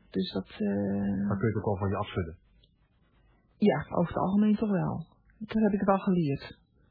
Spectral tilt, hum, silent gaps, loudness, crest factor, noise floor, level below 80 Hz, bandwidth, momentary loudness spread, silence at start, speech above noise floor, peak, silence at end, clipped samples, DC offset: -11 dB/octave; none; none; -29 LUFS; 18 dB; -67 dBFS; -56 dBFS; 4.9 kHz; 11 LU; 0.15 s; 38 dB; -12 dBFS; 0.4 s; under 0.1%; under 0.1%